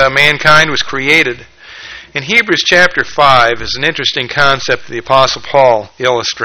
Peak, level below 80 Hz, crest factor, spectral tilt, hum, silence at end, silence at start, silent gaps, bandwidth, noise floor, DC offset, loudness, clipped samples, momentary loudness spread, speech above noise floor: 0 dBFS; -40 dBFS; 12 dB; -3 dB/octave; none; 0 s; 0 s; none; over 20 kHz; -31 dBFS; under 0.1%; -10 LUFS; 0.9%; 10 LU; 20 dB